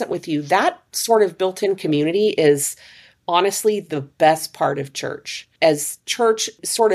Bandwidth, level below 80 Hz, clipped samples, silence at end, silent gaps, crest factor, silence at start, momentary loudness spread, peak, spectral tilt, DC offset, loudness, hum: 15.5 kHz; -68 dBFS; under 0.1%; 0 s; none; 18 dB; 0 s; 11 LU; -2 dBFS; -3.5 dB/octave; under 0.1%; -19 LUFS; none